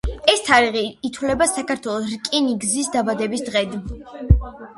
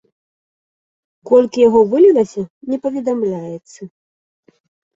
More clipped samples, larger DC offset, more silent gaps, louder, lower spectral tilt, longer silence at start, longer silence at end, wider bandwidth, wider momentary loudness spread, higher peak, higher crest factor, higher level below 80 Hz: neither; neither; second, none vs 2.50-2.61 s; second, -20 LUFS vs -14 LUFS; second, -4 dB/octave vs -7 dB/octave; second, 0.05 s vs 1.25 s; second, 0.05 s vs 1.1 s; first, 11.5 kHz vs 7.8 kHz; second, 11 LU vs 16 LU; about the same, 0 dBFS vs -2 dBFS; about the same, 20 dB vs 16 dB; first, -28 dBFS vs -58 dBFS